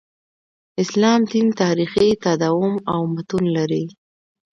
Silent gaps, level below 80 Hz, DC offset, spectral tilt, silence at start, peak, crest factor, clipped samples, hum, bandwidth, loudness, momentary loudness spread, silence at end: none; -56 dBFS; under 0.1%; -6 dB/octave; 0.75 s; -2 dBFS; 18 dB; under 0.1%; none; 9.2 kHz; -19 LUFS; 8 LU; 0.65 s